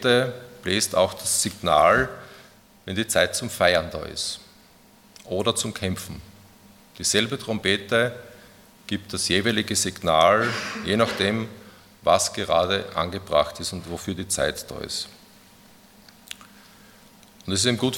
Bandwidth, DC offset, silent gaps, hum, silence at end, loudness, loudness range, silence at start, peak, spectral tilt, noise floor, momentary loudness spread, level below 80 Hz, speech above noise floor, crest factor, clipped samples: 18 kHz; under 0.1%; none; none; 0 s; -23 LUFS; 8 LU; 0 s; -2 dBFS; -3 dB/octave; -53 dBFS; 15 LU; -54 dBFS; 30 dB; 22 dB; under 0.1%